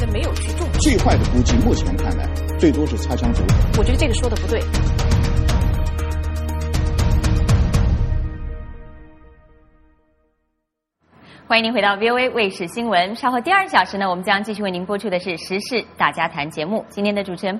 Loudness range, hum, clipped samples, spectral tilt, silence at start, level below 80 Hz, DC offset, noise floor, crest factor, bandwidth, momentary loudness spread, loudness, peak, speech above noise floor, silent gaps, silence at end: 5 LU; none; under 0.1%; -5.5 dB/octave; 0 s; -24 dBFS; under 0.1%; -76 dBFS; 18 dB; 14 kHz; 8 LU; -19 LUFS; 0 dBFS; 58 dB; none; 0 s